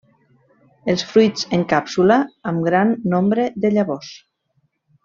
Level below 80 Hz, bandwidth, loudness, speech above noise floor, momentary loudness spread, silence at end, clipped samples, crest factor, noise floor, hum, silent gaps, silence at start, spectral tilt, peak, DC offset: -58 dBFS; 7.4 kHz; -18 LUFS; 49 dB; 8 LU; 0.85 s; under 0.1%; 18 dB; -67 dBFS; none; none; 0.85 s; -6 dB/octave; -2 dBFS; under 0.1%